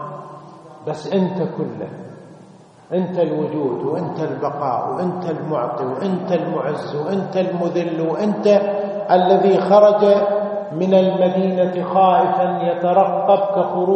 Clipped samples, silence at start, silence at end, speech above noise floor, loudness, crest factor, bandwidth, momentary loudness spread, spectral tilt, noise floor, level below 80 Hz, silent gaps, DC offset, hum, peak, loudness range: under 0.1%; 0 s; 0 s; 27 dB; -18 LUFS; 18 dB; 8.4 kHz; 11 LU; -8 dB/octave; -44 dBFS; -68 dBFS; none; under 0.1%; none; 0 dBFS; 8 LU